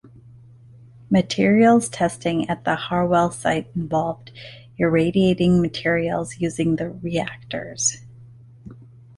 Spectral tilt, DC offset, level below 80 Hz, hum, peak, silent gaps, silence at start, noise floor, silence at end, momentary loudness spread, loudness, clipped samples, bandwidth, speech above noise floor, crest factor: -5 dB/octave; under 0.1%; -50 dBFS; none; -4 dBFS; none; 1.1 s; -46 dBFS; 0.35 s; 12 LU; -21 LUFS; under 0.1%; 11.5 kHz; 26 dB; 16 dB